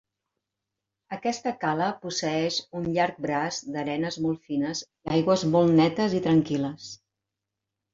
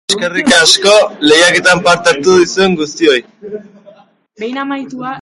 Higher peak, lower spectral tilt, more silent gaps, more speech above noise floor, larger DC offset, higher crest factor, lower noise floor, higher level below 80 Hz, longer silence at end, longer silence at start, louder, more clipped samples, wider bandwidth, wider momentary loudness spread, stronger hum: second, -8 dBFS vs 0 dBFS; first, -5.5 dB/octave vs -2.5 dB/octave; neither; first, 60 dB vs 32 dB; neither; first, 18 dB vs 12 dB; first, -86 dBFS vs -43 dBFS; second, -62 dBFS vs -50 dBFS; first, 1 s vs 0 s; first, 1.1 s vs 0.1 s; second, -26 LUFS vs -9 LUFS; neither; second, 7.8 kHz vs 16 kHz; second, 10 LU vs 18 LU; neither